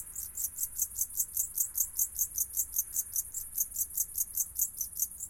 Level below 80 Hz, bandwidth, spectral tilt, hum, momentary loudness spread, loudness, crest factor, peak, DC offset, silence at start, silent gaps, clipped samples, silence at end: -58 dBFS; 17 kHz; 0.5 dB/octave; none; 4 LU; -31 LUFS; 22 dB; -12 dBFS; under 0.1%; 0 s; none; under 0.1%; 0 s